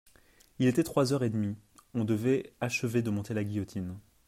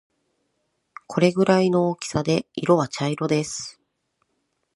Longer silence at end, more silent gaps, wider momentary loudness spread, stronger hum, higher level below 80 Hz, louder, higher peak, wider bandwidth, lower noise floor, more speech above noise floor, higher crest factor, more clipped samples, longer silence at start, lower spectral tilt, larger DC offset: second, 0.3 s vs 1.05 s; neither; about the same, 11 LU vs 12 LU; neither; about the same, -64 dBFS vs -60 dBFS; second, -31 LUFS vs -22 LUFS; second, -12 dBFS vs -4 dBFS; first, 16 kHz vs 11.5 kHz; second, -61 dBFS vs -74 dBFS; second, 32 dB vs 52 dB; about the same, 18 dB vs 20 dB; neither; second, 0.6 s vs 1.1 s; about the same, -6.5 dB/octave vs -5.5 dB/octave; neither